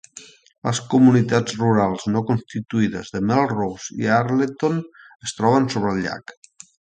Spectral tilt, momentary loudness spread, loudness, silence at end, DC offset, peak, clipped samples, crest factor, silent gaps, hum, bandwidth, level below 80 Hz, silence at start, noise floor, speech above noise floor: -6 dB/octave; 13 LU; -20 LUFS; 0.65 s; under 0.1%; -2 dBFS; under 0.1%; 18 dB; 0.58-0.62 s; none; 9.4 kHz; -54 dBFS; 0.15 s; -45 dBFS; 25 dB